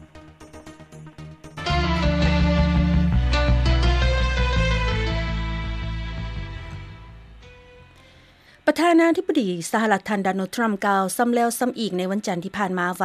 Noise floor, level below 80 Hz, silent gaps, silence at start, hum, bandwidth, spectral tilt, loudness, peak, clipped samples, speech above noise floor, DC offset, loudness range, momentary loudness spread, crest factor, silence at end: -52 dBFS; -28 dBFS; none; 0 s; none; 14.5 kHz; -6 dB/octave; -22 LUFS; -4 dBFS; under 0.1%; 30 dB; under 0.1%; 9 LU; 19 LU; 18 dB; 0 s